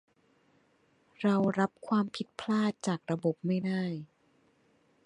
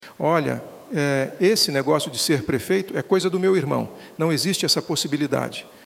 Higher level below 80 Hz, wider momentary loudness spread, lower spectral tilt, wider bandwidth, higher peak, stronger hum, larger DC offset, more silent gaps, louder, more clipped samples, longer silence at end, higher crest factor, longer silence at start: second, -76 dBFS vs -60 dBFS; about the same, 8 LU vs 7 LU; first, -6.5 dB/octave vs -4 dB/octave; second, 10.5 kHz vs 16.5 kHz; second, -16 dBFS vs -6 dBFS; neither; neither; neither; second, -32 LUFS vs -22 LUFS; neither; first, 1 s vs 0.15 s; about the same, 18 dB vs 16 dB; first, 1.2 s vs 0 s